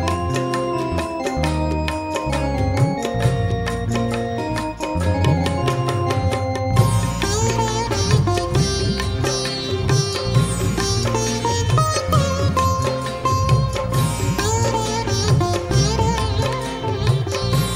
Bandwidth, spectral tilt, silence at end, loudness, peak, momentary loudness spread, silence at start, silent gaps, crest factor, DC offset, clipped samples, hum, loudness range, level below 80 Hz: 16 kHz; -5 dB/octave; 0 s; -20 LUFS; -2 dBFS; 5 LU; 0 s; none; 18 dB; under 0.1%; under 0.1%; none; 2 LU; -32 dBFS